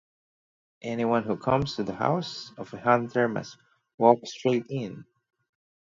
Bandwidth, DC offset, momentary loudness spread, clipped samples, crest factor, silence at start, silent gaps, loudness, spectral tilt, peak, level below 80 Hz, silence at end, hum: 7.6 kHz; under 0.1%; 17 LU; under 0.1%; 26 dB; 0.85 s; 3.94-3.98 s; -26 LUFS; -6.5 dB/octave; -2 dBFS; -60 dBFS; 0.95 s; none